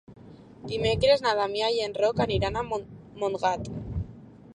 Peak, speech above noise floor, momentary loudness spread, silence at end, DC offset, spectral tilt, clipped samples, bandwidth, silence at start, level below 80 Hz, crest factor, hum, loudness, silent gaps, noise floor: -8 dBFS; 21 dB; 14 LU; 0.05 s; under 0.1%; -5.5 dB/octave; under 0.1%; 10.5 kHz; 0.1 s; -46 dBFS; 20 dB; none; -27 LUFS; none; -47 dBFS